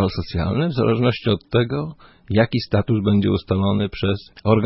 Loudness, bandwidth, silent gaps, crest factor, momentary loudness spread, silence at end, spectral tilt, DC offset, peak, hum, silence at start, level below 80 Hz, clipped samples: -20 LUFS; 5.8 kHz; none; 16 dB; 6 LU; 0 s; -11 dB/octave; under 0.1%; -4 dBFS; none; 0 s; -42 dBFS; under 0.1%